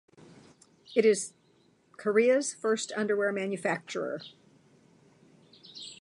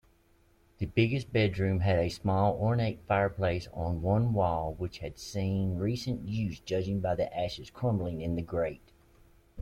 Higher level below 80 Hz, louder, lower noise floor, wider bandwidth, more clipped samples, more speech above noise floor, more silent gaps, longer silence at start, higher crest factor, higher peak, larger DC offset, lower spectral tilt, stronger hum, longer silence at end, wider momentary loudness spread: second, -84 dBFS vs -50 dBFS; about the same, -29 LUFS vs -31 LUFS; about the same, -65 dBFS vs -65 dBFS; about the same, 11.5 kHz vs 12 kHz; neither; about the same, 37 dB vs 35 dB; neither; about the same, 0.9 s vs 0.8 s; about the same, 20 dB vs 18 dB; first, -10 dBFS vs -14 dBFS; neither; second, -3.5 dB/octave vs -7.5 dB/octave; neither; about the same, 0.1 s vs 0 s; first, 17 LU vs 8 LU